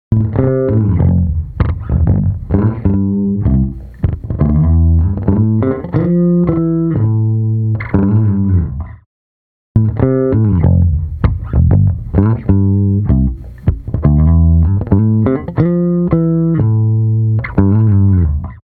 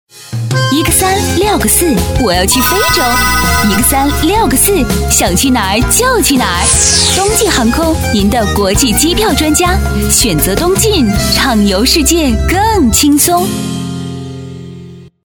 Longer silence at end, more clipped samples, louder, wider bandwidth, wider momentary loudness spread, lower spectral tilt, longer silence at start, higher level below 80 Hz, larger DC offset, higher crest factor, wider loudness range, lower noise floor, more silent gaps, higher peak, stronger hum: about the same, 0.1 s vs 0.15 s; neither; second, -13 LUFS vs -9 LUFS; second, 2.8 kHz vs over 20 kHz; about the same, 6 LU vs 8 LU; first, -13.5 dB/octave vs -3.5 dB/octave; about the same, 0.1 s vs 0.15 s; about the same, -24 dBFS vs -20 dBFS; neither; about the same, 12 dB vs 10 dB; about the same, 2 LU vs 1 LU; first, under -90 dBFS vs -31 dBFS; first, 9.06-9.75 s vs none; about the same, 0 dBFS vs 0 dBFS; neither